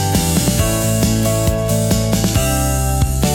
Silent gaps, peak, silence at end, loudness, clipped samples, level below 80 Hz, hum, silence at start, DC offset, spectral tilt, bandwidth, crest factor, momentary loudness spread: none; -2 dBFS; 0 s; -16 LUFS; under 0.1%; -24 dBFS; none; 0 s; under 0.1%; -5 dB/octave; 18 kHz; 12 dB; 2 LU